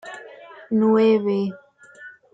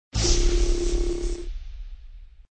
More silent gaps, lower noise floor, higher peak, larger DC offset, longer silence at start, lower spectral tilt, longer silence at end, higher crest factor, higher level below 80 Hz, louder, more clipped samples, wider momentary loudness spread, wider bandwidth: neither; about the same, -45 dBFS vs -43 dBFS; about the same, -8 dBFS vs -8 dBFS; neither; about the same, 0.05 s vs 0.15 s; first, -8 dB/octave vs -4 dB/octave; first, 0.25 s vs 0.1 s; about the same, 14 dB vs 16 dB; second, -72 dBFS vs -26 dBFS; first, -20 LUFS vs -26 LUFS; neither; about the same, 22 LU vs 21 LU; second, 7.8 kHz vs 9.2 kHz